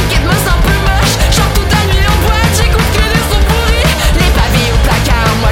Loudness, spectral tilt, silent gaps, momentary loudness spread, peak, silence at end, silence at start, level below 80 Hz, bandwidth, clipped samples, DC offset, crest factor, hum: -10 LUFS; -4.5 dB/octave; none; 1 LU; 0 dBFS; 0 s; 0 s; -12 dBFS; 17 kHz; under 0.1%; under 0.1%; 10 dB; none